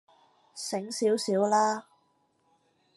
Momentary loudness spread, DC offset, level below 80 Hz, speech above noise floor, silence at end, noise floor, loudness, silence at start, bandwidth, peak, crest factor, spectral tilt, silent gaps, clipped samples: 13 LU; under 0.1%; -86 dBFS; 43 dB; 1.15 s; -70 dBFS; -28 LUFS; 0.55 s; 12.5 kHz; -12 dBFS; 18 dB; -4 dB/octave; none; under 0.1%